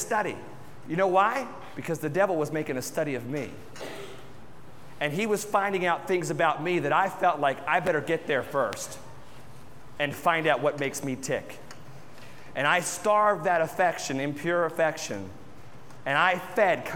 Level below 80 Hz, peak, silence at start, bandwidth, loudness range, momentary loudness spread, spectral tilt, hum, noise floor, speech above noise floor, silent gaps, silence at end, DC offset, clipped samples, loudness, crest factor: -64 dBFS; -8 dBFS; 0 s; 18 kHz; 5 LU; 18 LU; -4 dB/octave; none; -49 dBFS; 23 dB; none; 0 s; 0.5%; under 0.1%; -27 LUFS; 20 dB